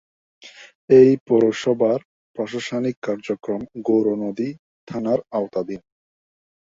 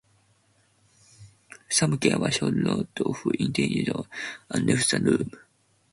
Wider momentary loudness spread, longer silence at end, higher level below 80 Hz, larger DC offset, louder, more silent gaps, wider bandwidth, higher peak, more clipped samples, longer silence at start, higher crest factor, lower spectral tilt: first, 15 LU vs 9 LU; first, 0.95 s vs 0.55 s; about the same, -62 dBFS vs -58 dBFS; neither; first, -20 LUFS vs -25 LUFS; first, 0.75-0.88 s, 1.21-1.26 s, 2.05-2.34 s, 2.97-3.02 s, 4.59-4.87 s vs none; second, 7.6 kHz vs 11.5 kHz; first, -2 dBFS vs -8 dBFS; neither; second, 0.45 s vs 1.2 s; about the same, 20 dB vs 20 dB; first, -7 dB/octave vs -4.5 dB/octave